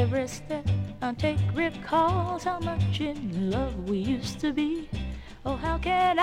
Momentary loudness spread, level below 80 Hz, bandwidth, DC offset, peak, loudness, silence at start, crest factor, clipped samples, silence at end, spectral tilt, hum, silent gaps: 9 LU; -42 dBFS; 11.5 kHz; under 0.1%; -10 dBFS; -29 LUFS; 0 s; 18 dB; under 0.1%; 0 s; -6.5 dB/octave; none; none